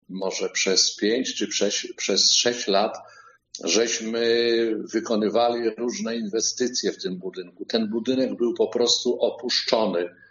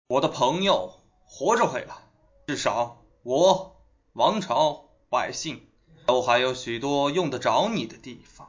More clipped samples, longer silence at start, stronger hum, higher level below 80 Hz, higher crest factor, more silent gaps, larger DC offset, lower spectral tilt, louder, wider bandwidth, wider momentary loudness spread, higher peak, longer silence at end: neither; about the same, 0.1 s vs 0.1 s; neither; second, -74 dBFS vs -60 dBFS; about the same, 20 dB vs 20 dB; neither; neither; second, -2 dB/octave vs -4 dB/octave; about the same, -23 LUFS vs -25 LUFS; about the same, 7.6 kHz vs 7.6 kHz; second, 9 LU vs 20 LU; about the same, -4 dBFS vs -6 dBFS; first, 0.2 s vs 0.05 s